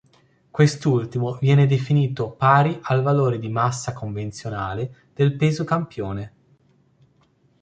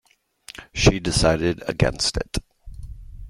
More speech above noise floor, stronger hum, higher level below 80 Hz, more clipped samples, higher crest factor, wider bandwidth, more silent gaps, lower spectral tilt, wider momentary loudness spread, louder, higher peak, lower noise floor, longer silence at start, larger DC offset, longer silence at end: first, 40 dB vs 27 dB; neither; second, -52 dBFS vs -34 dBFS; neither; about the same, 20 dB vs 22 dB; second, 9 kHz vs 16 kHz; neither; first, -7 dB/octave vs -4.5 dB/octave; second, 13 LU vs 22 LU; about the same, -21 LUFS vs -22 LUFS; about the same, -2 dBFS vs -2 dBFS; first, -61 dBFS vs -48 dBFS; about the same, 0.55 s vs 0.6 s; neither; first, 1.35 s vs 0 s